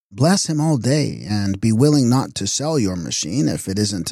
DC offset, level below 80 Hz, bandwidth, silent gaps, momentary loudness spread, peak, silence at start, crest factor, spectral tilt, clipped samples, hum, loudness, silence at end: under 0.1%; -52 dBFS; 15 kHz; none; 7 LU; -4 dBFS; 0.1 s; 14 dB; -5 dB/octave; under 0.1%; none; -19 LUFS; 0 s